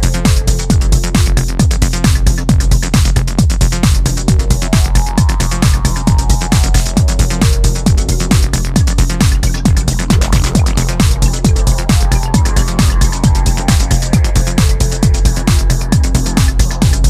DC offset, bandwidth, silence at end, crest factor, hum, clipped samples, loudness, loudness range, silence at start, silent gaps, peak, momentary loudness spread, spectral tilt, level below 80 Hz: under 0.1%; 15.5 kHz; 0 s; 10 dB; none; under 0.1%; -13 LUFS; 0 LU; 0 s; none; 0 dBFS; 1 LU; -5 dB/octave; -12 dBFS